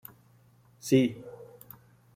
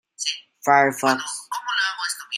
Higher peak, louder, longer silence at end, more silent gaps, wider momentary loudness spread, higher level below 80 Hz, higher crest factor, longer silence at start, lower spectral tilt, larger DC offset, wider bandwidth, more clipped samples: second, -10 dBFS vs -2 dBFS; second, -27 LUFS vs -22 LUFS; first, 0.7 s vs 0 s; neither; first, 25 LU vs 10 LU; first, -68 dBFS vs -76 dBFS; about the same, 22 dB vs 20 dB; first, 0.85 s vs 0.2 s; first, -6 dB/octave vs -2 dB/octave; neither; about the same, 16 kHz vs 15.5 kHz; neither